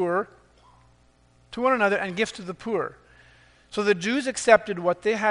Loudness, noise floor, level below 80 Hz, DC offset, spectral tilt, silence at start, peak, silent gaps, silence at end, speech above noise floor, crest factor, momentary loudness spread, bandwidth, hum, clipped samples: -24 LUFS; -59 dBFS; -60 dBFS; under 0.1%; -4 dB/octave; 0 s; 0 dBFS; none; 0 s; 36 dB; 24 dB; 15 LU; 10.5 kHz; none; under 0.1%